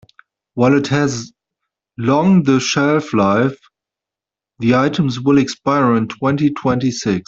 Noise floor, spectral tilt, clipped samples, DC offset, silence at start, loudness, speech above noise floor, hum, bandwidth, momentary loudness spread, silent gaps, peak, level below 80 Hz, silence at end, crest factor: -87 dBFS; -6 dB/octave; under 0.1%; under 0.1%; 0.55 s; -16 LUFS; 72 dB; none; 7.8 kHz; 8 LU; none; -2 dBFS; -52 dBFS; 0.05 s; 14 dB